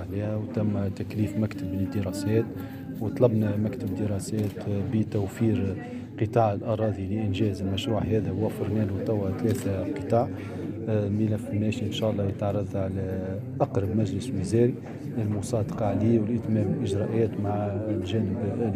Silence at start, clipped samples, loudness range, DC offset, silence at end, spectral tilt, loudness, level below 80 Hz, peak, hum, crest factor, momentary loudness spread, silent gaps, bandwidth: 0 s; under 0.1%; 2 LU; under 0.1%; 0 s; -7.5 dB/octave; -28 LUFS; -58 dBFS; -8 dBFS; none; 20 dB; 7 LU; none; 15 kHz